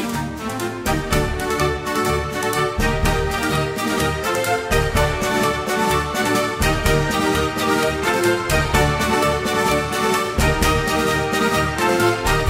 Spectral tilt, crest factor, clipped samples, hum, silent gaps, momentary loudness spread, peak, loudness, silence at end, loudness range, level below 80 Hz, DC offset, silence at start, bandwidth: -4.5 dB/octave; 16 dB; under 0.1%; none; none; 4 LU; -2 dBFS; -19 LUFS; 0 s; 2 LU; -30 dBFS; under 0.1%; 0 s; 16.5 kHz